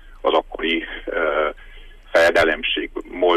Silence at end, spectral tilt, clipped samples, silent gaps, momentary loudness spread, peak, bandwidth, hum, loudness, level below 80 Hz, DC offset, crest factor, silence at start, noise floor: 0 s; -3.5 dB/octave; under 0.1%; none; 9 LU; -6 dBFS; 15 kHz; none; -20 LUFS; -42 dBFS; under 0.1%; 16 dB; 0.05 s; -41 dBFS